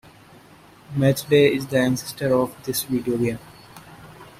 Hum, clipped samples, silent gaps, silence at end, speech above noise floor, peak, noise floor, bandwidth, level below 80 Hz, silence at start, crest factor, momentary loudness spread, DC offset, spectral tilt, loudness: none; under 0.1%; none; 0.1 s; 28 dB; -4 dBFS; -49 dBFS; 16 kHz; -56 dBFS; 0.9 s; 18 dB; 10 LU; under 0.1%; -5.5 dB/octave; -21 LUFS